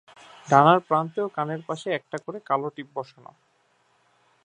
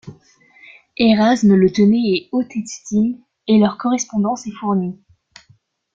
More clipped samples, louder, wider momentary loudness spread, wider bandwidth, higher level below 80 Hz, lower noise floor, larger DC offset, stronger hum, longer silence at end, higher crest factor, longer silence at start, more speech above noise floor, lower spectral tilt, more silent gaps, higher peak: neither; second, -24 LUFS vs -17 LUFS; first, 18 LU vs 12 LU; first, 10 kHz vs 7.6 kHz; second, -76 dBFS vs -56 dBFS; first, -66 dBFS vs -56 dBFS; neither; neither; first, 1.4 s vs 1 s; first, 24 dB vs 16 dB; first, 0.45 s vs 0.05 s; about the same, 42 dB vs 40 dB; about the same, -6.5 dB/octave vs -6 dB/octave; neither; about the same, -2 dBFS vs -2 dBFS